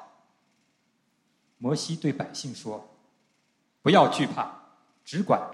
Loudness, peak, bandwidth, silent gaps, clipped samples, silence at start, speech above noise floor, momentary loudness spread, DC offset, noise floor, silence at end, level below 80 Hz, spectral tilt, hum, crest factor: -26 LUFS; -6 dBFS; 12.5 kHz; none; under 0.1%; 0 s; 46 dB; 17 LU; under 0.1%; -71 dBFS; 0 s; -74 dBFS; -5.5 dB/octave; none; 24 dB